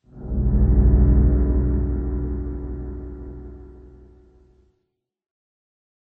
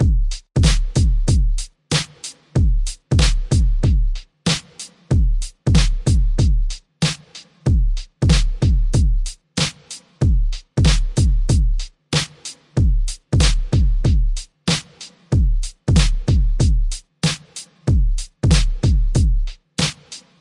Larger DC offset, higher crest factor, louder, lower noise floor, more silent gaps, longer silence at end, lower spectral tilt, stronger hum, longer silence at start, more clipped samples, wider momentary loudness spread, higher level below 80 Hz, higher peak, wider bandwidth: neither; about the same, 16 dB vs 14 dB; about the same, -21 LUFS vs -20 LUFS; first, -76 dBFS vs -43 dBFS; neither; first, 2.25 s vs 0.2 s; first, -14 dB/octave vs -5 dB/octave; neither; first, 0.15 s vs 0 s; neither; first, 21 LU vs 10 LU; about the same, -22 dBFS vs -20 dBFS; second, -6 dBFS vs -2 dBFS; second, 2 kHz vs 11.5 kHz